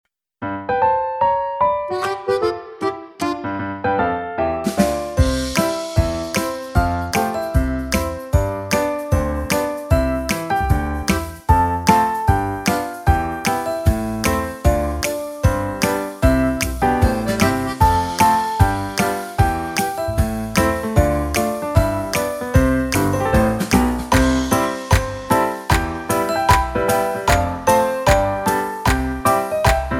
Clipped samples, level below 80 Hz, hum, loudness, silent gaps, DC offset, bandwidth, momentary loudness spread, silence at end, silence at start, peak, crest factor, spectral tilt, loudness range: under 0.1%; -26 dBFS; none; -19 LUFS; none; under 0.1%; 17.5 kHz; 5 LU; 0 s; 0.4 s; 0 dBFS; 18 dB; -5.5 dB/octave; 3 LU